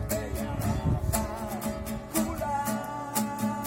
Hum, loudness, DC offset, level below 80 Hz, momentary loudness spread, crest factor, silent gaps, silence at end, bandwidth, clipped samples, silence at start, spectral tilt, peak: none; -31 LUFS; under 0.1%; -40 dBFS; 5 LU; 20 dB; none; 0 s; 17 kHz; under 0.1%; 0 s; -5.5 dB/octave; -12 dBFS